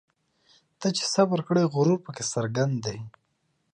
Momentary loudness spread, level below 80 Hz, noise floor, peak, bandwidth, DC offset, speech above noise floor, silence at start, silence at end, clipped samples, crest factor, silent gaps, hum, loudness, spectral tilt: 10 LU; -66 dBFS; -73 dBFS; -10 dBFS; 11.5 kHz; under 0.1%; 48 dB; 0.8 s; 0.65 s; under 0.1%; 18 dB; none; none; -26 LUFS; -5 dB/octave